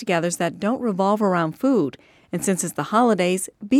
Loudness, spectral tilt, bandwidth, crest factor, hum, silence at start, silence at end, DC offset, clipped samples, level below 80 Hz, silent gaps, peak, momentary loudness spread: -22 LUFS; -5 dB/octave; 16 kHz; 16 dB; none; 0 s; 0 s; under 0.1%; under 0.1%; -64 dBFS; none; -6 dBFS; 7 LU